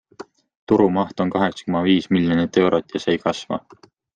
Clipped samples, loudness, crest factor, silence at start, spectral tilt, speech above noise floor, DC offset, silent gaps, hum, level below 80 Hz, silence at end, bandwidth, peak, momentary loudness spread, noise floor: under 0.1%; -20 LUFS; 16 dB; 0.2 s; -6.5 dB/octave; 23 dB; under 0.1%; 0.57-0.67 s; none; -58 dBFS; 0.55 s; 9.2 kHz; -4 dBFS; 6 LU; -42 dBFS